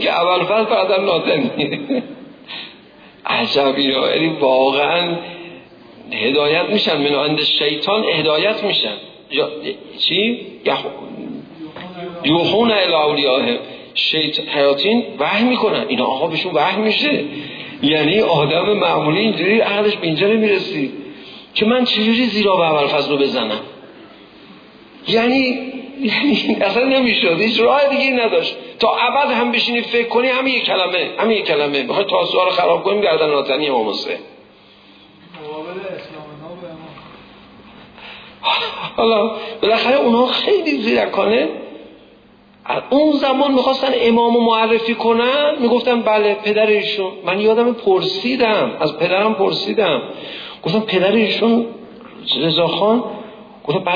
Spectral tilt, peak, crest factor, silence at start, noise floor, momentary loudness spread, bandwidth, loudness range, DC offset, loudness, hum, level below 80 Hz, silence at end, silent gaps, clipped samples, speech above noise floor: -6 dB/octave; -2 dBFS; 14 dB; 0 s; -47 dBFS; 15 LU; 5.2 kHz; 5 LU; under 0.1%; -16 LUFS; none; -58 dBFS; 0 s; none; under 0.1%; 31 dB